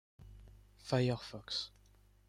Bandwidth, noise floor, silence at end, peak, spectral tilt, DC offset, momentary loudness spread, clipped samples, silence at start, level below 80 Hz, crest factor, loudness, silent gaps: 12 kHz; -65 dBFS; 0.6 s; -20 dBFS; -6 dB/octave; under 0.1%; 23 LU; under 0.1%; 0.2 s; -62 dBFS; 22 dB; -38 LUFS; none